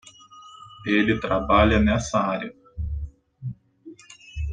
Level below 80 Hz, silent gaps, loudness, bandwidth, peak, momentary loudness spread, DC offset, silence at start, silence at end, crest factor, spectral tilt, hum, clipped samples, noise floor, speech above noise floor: -36 dBFS; none; -22 LUFS; 9.4 kHz; -4 dBFS; 24 LU; under 0.1%; 0.35 s; 0 s; 22 dB; -6 dB/octave; none; under 0.1%; -47 dBFS; 27 dB